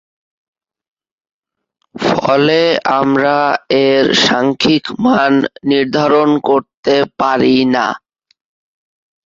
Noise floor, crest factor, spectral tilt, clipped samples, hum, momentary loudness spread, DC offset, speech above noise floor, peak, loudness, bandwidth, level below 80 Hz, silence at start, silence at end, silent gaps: -74 dBFS; 14 dB; -5 dB/octave; under 0.1%; none; 5 LU; under 0.1%; 62 dB; 0 dBFS; -13 LUFS; 7.6 kHz; -52 dBFS; 1.95 s; 1.3 s; 6.74-6.83 s